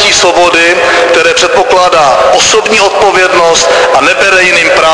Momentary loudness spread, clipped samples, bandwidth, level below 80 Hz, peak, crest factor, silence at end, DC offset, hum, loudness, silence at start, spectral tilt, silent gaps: 2 LU; 3%; 11 kHz; -38 dBFS; 0 dBFS; 6 dB; 0 s; under 0.1%; none; -5 LUFS; 0 s; -1 dB/octave; none